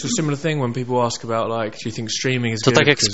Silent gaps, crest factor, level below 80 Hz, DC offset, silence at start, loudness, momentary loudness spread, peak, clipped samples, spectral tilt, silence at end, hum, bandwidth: none; 20 dB; -54 dBFS; 0.8%; 0 s; -20 LUFS; 10 LU; 0 dBFS; under 0.1%; -4 dB/octave; 0 s; none; 8.2 kHz